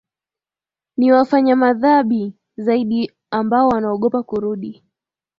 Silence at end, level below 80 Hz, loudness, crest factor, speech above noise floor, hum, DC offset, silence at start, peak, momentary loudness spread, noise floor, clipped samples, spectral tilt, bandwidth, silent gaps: 0.65 s; -58 dBFS; -17 LUFS; 16 dB; over 74 dB; none; under 0.1%; 1 s; -2 dBFS; 11 LU; under -90 dBFS; under 0.1%; -8.5 dB/octave; 5.6 kHz; none